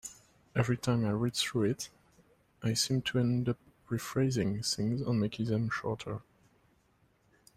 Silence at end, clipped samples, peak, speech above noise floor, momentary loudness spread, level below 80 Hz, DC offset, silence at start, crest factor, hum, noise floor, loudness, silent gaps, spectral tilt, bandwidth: 1.35 s; under 0.1%; -14 dBFS; 38 dB; 9 LU; -62 dBFS; under 0.1%; 0.05 s; 18 dB; none; -70 dBFS; -32 LUFS; none; -5 dB/octave; 15.5 kHz